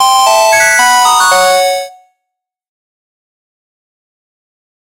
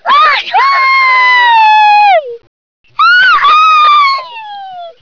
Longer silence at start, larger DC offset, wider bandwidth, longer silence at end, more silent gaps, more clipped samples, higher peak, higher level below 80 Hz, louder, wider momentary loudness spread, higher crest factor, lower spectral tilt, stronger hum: about the same, 0 s vs 0.05 s; second, under 0.1% vs 0.3%; first, 17 kHz vs 5.4 kHz; first, 2.9 s vs 0.1 s; second, none vs 2.47-2.84 s; neither; about the same, 0 dBFS vs -2 dBFS; first, -50 dBFS vs -56 dBFS; about the same, -7 LUFS vs -6 LUFS; second, 8 LU vs 20 LU; first, 12 dB vs 6 dB; about the same, 1.5 dB/octave vs 0.5 dB/octave; neither